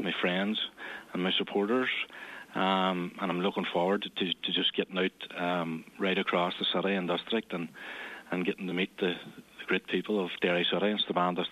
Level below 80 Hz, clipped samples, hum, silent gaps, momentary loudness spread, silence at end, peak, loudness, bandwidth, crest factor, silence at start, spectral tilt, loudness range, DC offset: -76 dBFS; under 0.1%; none; none; 11 LU; 0 s; -12 dBFS; -31 LUFS; 13.5 kHz; 18 dB; 0 s; -6 dB/octave; 3 LU; under 0.1%